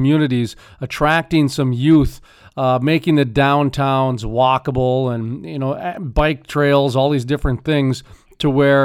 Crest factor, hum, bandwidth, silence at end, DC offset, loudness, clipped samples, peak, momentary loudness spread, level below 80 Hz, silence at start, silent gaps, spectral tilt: 14 dB; none; 15 kHz; 0 s; under 0.1%; -17 LUFS; under 0.1%; -2 dBFS; 9 LU; -34 dBFS; 0 s; none; -7 dB/octave